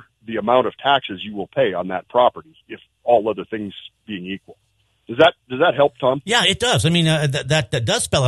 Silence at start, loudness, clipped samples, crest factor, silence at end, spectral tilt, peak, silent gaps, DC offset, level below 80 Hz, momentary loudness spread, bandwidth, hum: 0.3 s; -19 LUFS; under 0.1%; 18 dB; 0 s; -4.5 dB/octave; 0 dBFS; none; under 0.1%; -52 dBFS; 16 LU; 12.5 kHz; none